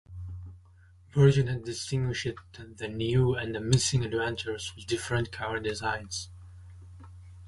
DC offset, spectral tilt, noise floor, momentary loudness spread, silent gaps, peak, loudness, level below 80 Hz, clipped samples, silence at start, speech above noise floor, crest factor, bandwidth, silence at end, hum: under 0.1%; -5 dB/octave; -56 dBFS; 25 LU; none; -8 dBFS; -29 LUFS; -50 dBFS; under 0.1%; 0.1 s; 28 dB; 22 dB; 11.5 kHz; 0 s; none